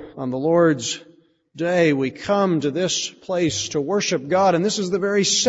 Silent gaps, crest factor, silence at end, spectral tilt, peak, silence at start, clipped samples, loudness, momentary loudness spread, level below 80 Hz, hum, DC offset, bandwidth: none; 16 dB; 0 s; -4 dB/octave; -4 dBFS; 0 s; under 0.1%; -20 LUFS; 7 LU; -60 dBFS; none; under 0.1%; 8 kHz